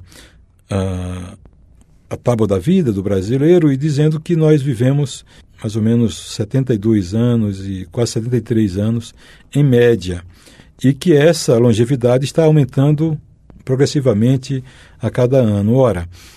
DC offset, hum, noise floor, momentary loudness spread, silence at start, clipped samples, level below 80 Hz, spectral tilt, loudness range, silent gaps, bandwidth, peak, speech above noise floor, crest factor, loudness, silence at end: under 0.1%; none; -47 dBFS; 12 LU; 0 s; under 0.1%; -44 dBFS; -7 dB/octave; 4 LU; none; 13.5 kHz; -2 dBFS; 32 dB; 14 dB; -15 LUFS; 0.25 s